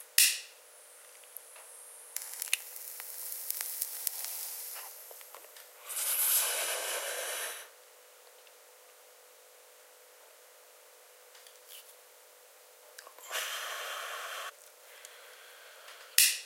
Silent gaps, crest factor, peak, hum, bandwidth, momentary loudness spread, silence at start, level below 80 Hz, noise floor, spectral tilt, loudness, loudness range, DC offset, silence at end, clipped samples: none; 36 dB; -2 dBFS; none; 17 kHz; 28 LU; 0 s; under -90 dBFS; -58 dBFS; 4.5 dB/octave; -32 LUFS; 21 LU; under 0.1%; 0 s; under 0.1%